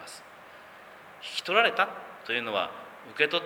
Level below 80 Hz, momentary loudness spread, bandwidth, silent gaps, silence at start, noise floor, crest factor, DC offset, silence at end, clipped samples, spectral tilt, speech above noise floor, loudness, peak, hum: -78 dBFS; 25 LU; over 20 kHz; none; 0 s; -49 dBFS; 22 dB; under 0.1%; 0 s; under 0.1%; -2.5 dB/octave; 22 dB; -27 LUFS; -8 dBFS; none